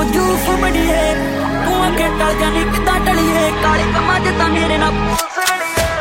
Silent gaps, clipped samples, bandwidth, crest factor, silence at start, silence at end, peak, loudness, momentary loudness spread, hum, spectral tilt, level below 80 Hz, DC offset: none; under 0.1%; 16.5 kHz; 14 dB; 0 s; 0 s; -2 dBFS; -15 LUFS; 3 LU; none; -4.5 dB/octave; -24 dBFS; under 0.1%